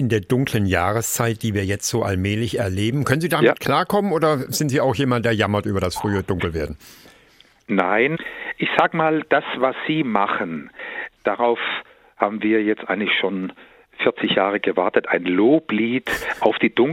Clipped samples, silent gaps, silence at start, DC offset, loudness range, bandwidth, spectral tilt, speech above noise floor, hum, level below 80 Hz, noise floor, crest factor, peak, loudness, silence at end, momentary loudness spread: under 0.1%; none; 0 s; under 0.1%; 3 LU; 16.5 kHz; -5 dB/octave; 33 dB; none; -52 dBFS; -53 dBFS; 20 dB; 0 dBFS; -20 LUFS; 0 s; 7 LU